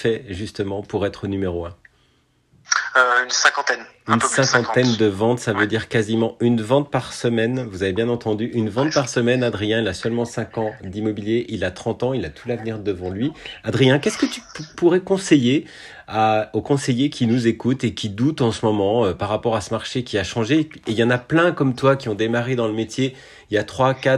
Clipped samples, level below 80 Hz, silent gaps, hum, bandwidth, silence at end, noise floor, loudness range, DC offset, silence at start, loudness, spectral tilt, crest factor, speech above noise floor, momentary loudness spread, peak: under 0.1%; -54 dBFS; none; none; 12 kHz; 0 s; -61 dBFS; 4 LU; under 0.1%; 0 s; -20 LUFS; -5 dB/octave; 20 dB; 41 dB; 9 LU; 0 dBFS